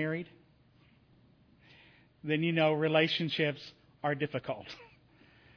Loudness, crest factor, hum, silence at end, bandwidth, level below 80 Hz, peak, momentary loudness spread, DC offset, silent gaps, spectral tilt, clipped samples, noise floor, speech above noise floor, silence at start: -31 LUFS; 22 dB; none; 0.7 s; 5.4 kHz; -72 dBFS; -14 dBFS; 20 LU; under 0.1%; none; -7 dB/octave; under 0.1%; -64 dBFS; 33 dB; 0 s